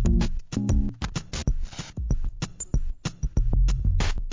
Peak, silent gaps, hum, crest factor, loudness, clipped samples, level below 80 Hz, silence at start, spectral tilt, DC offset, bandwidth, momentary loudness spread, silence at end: -10 dBFS; none; none; 14 dB; -29 LUFS; under 0.1%; -26 dBFS; 0 s; -5.5 dB/octave; 0.1%; 7.6 kHz; 9 LU; 0 s